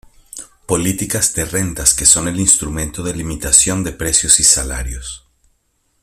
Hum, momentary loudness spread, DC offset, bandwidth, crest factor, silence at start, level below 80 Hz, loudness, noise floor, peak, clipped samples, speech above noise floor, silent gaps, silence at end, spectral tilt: none; 19 LU; under 0.1%; over 20 kHz; 18 dB; 0.35 s; -32 dBFS; -13 LUFS; -64 dBFS; 0 dBFS; under 0.1%; 48 dB; none; 0.85 s; -2.5 dB/octave